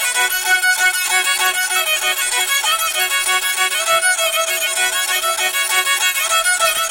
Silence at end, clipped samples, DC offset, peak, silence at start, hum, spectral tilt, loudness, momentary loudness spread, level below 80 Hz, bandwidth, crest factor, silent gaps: 0 s; under 0.1%; under 0.1%; -2 dBFS; 0 s; none; 3 dB/octave; -15 LUFS; 2 LU; -56 dBFS; 17 kHz; 14 dB; none